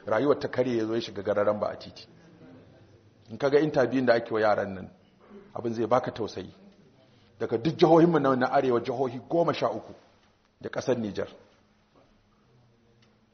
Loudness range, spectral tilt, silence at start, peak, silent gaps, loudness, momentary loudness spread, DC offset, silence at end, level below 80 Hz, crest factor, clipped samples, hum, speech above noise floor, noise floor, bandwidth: 8 LU; -5.5 dB/octave; 0.05 s; -8 dBFS; none; -26 LUFS; 18 LU; under 0.1%; 2 s; -66 dBFS; 20 dB; under 0.1%; none; 37 dB; -63 dBFS; 6.6 kHz